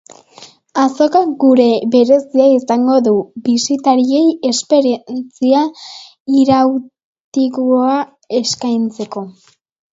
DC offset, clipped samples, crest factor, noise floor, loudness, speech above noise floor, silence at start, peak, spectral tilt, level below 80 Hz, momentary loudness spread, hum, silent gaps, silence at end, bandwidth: under 0.1%; under 0.1%; 14 dB; -42 dBFS; -13 LUFS; 29 dB; 0.4 s; 0 dBFS; -4.5 dB/octave; -60 dBFS; 12 LU; none; 6.20-6.25 s, 7.04-7.32 s; 0.6 s; 7.8 kHz